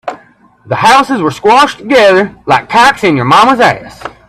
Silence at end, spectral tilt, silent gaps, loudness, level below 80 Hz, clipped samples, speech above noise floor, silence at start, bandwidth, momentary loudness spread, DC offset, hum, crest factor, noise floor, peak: 0.2 s; -4.5 dB/octave; none; -8 LUFS; -44 dBFS; 0.3%; 35 dB; 0.05 s; 15 kHz; 10 LU; under 0.1%; none; 8 dB; -43 dBFS; 0 dBFS